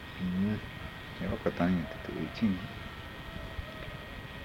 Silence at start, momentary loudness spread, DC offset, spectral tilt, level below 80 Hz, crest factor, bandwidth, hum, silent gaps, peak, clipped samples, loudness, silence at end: 0 s; 12 LU; under 0.1%; -7.5 dB/octave; -50 dBFS; 20 dB; 16.5 kHz; none; none; -16 dBFS; under 0.1%; -36 LUFS; 0 s